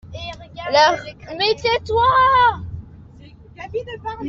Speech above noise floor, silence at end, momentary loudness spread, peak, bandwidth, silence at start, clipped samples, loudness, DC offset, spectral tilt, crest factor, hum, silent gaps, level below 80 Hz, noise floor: 26 dB; 0 s; 19 LU; -2 dBFS; 7.4 kHz; 0.05 s; under 0.1%; -17 LUFS; under 0.1%; -4 dB/octave; 18 dB; none; none; -44 dBFS; -43 dBFS